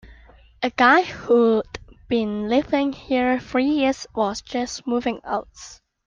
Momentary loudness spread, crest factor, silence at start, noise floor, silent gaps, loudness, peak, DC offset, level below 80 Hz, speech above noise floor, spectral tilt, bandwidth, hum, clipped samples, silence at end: 12 LU; 18 dB; 0.05 s; -49 dBFS; none; -21 LUFS; -4 dBFS; under 0.1%; -50 dBFS; 29 dB; -4.5 dB/octave; 9.2 kHz; none; under 0.1%; 0.35 s